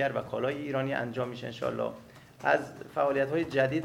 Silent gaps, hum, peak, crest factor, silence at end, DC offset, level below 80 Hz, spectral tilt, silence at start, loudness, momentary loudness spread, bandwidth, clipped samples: none; none; -10 dBFS; 20 dB; 0 s; under 0.1%; -66 dBFS; -6.5 dB/octave; 0 s; -31 LUFS; 8 LU; 16 kHz; under 0.1%